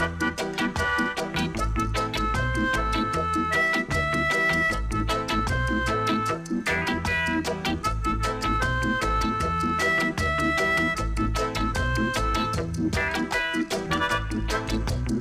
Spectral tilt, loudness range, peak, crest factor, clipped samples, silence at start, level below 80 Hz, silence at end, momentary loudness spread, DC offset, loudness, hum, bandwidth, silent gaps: -5 dB/octave; 2 LU; -12 dBFS; 12 dB; under 0.1%; 0 s; -34 dBFS; 0 s; 5 LU; under 0.1%; -25 LUFS; none; 15.5 kHz; none